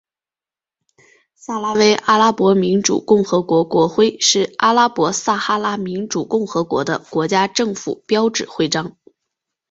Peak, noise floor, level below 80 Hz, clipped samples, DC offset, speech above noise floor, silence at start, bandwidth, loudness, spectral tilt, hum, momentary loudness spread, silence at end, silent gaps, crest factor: 0 dBFS; under -90 dBFS; -58 dBFS; under 0.1%; under 0.1%; over 74 dB; 1.5 s; 8 kHz; -17 LUFS; -4 dB/octave; none; 9 LU; 0.8 s; none; 16 dB